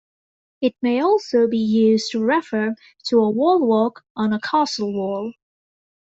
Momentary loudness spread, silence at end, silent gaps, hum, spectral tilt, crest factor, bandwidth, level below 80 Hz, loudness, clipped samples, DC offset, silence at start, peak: 8 LU; 0.75 s; 4.10-4.15 s; none; -5.5 dB/octave; 14 dB; 8 kHz; -66 dBFS; -20 LUFS; under 0.1%; under 0.1%; 0.6 s; -6 dBFS